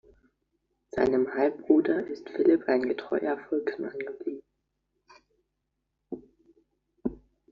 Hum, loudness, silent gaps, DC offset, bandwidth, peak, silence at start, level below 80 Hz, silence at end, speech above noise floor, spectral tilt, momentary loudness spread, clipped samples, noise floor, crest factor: none; -28 LUFS; none; under 0.1%; 6.8 kHz; -8 dBFS; 0.95 s; -62 dBFS; 0.35 s; 54 dB; -5 dB/octave; 17 LU; under 0.1%; -81 dBFS; 22 dB